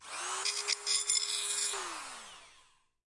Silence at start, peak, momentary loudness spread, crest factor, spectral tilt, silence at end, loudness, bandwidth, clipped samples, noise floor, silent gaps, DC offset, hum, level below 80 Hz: 0 s; -14 dBFS; 16 LU; 22 dB; 3 dB/octave; 0.45 s; -32 LUFS; 11.5 kHz; under 0.1%; -66 dBFS; none; under 0.1%; none; -74 dBFS